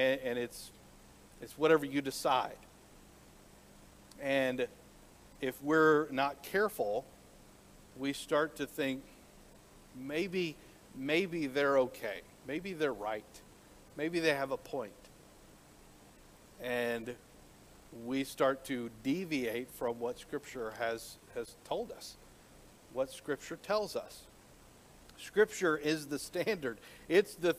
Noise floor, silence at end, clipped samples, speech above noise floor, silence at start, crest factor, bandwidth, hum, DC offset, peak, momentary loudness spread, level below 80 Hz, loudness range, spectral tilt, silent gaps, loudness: -59 dBFS; 0 s; under 0.1%; 25 dB; 0 s; 22 dB; 15.5 kHz; none; under 0.1%; -14 dBFS; 18 LU; -66 dBFS; 8 LU; -4.5 dB/octave; none; -35 LUFS